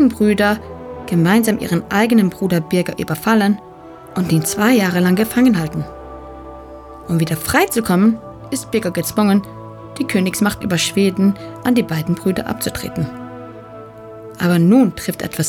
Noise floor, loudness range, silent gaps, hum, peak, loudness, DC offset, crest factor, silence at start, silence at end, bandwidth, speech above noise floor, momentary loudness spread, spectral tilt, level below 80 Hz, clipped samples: -37 dBFS; 3 LU; none; none; -2 dBFS; -17 LUFS; under 0.1%; 16 dB; 0 s; 0 s; 19 kHz; 21 dB; 20 LU; -5.5 dB/octave; -44 dBFS; under 0.1%